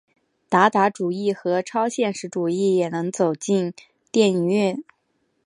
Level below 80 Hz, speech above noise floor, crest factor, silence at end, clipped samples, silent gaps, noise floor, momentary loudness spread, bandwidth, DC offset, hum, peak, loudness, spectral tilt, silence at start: -74 dBFS; 49 dB; 20 dB; 0.65 s; under 0.1%; none; -70 dBFS; 7 LU; 11 kHz; under 0.1%; none; -2 dBFS; -22 LUFS; -5.5 dB/octave; 0.5 s